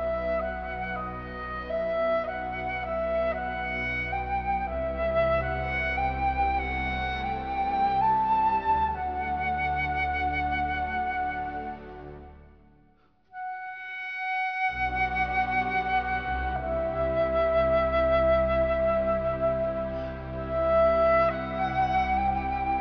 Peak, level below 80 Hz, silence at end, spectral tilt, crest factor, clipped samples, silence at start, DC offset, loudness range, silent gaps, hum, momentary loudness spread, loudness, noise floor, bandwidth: -14 dBFS; -40 dBFS; 0 s; -7.5 dB/octave; 14 dB; under 0.1%; 0 s; under 0.1%; 6 LU; none; none; 11 LU; -27 LUFS; -63 dBFS; 5.4 kHz